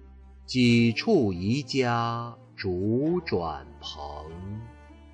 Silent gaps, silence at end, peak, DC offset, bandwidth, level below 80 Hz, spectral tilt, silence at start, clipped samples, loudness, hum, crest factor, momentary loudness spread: none; 0 s; -12 dBFS; under 0.1%; 9.2 kHz; -50 dBFS; -6.5 dB/octave; 0 s; under 0.1%; -26 LUFS; none; 16 dB; 17 LU